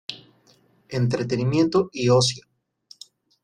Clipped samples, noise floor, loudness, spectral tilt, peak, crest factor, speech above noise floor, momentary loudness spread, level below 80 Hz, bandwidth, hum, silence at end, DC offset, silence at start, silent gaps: under 0.1%; -59 dBFS; -22 LUFS; -5.5 dB/octave; -6 dBFS; 18 dB; 39 dB; 19 LU; -60 dBFS; 10.5 kHz; none; 1.05 s; under 0.1%; 0.1 s; none